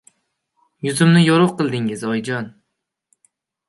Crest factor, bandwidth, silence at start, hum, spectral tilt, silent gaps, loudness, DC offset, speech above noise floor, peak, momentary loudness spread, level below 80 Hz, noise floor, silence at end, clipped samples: 18 dB; 11.5 kHz; 0.85 s; none; -6 dB/octave; none; -17 LUFS; under 0.1%; 61 dB; -2 dBFS; 14 LU; -64 dBFS; -77 dBFS; 1.2 s; under 0.1%